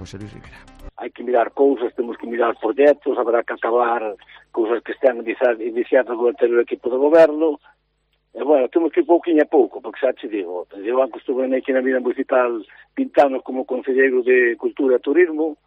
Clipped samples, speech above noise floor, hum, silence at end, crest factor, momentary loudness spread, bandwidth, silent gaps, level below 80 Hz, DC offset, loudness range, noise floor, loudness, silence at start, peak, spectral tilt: under 0.1%; 49 dB; 50 Hz at -65 dBFS; 0.1 s; 16 dB; 12 LU; 6.8 kHz; none; -56 dBFS; under 0.1%; 3 LU; -67 dBFS; -19 LUFS; 0 s; -4 dBFS; -6.5 dB/octave